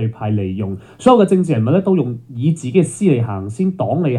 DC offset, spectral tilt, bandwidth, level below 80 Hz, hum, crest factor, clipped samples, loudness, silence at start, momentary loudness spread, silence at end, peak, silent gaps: under 0.1%; -8 dB/octave; 11 kHz; -58 dBFS; none; 14 dB; under 0.1%; -16 LUFS; 0 s; 10 LU; 0 s; 0 dBFS; none